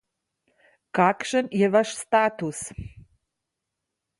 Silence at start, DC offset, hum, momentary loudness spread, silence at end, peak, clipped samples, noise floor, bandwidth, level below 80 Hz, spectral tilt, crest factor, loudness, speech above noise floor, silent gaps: 0.95 s; under 0.1%; none; 15 LU; 1.2 s; -6 dBFS; under 0.1%; -83 dBFS; 11.5 kHz; -56 dBFS; -5 dB/octave; 20 dB; -23 LUFS; 60 dB; none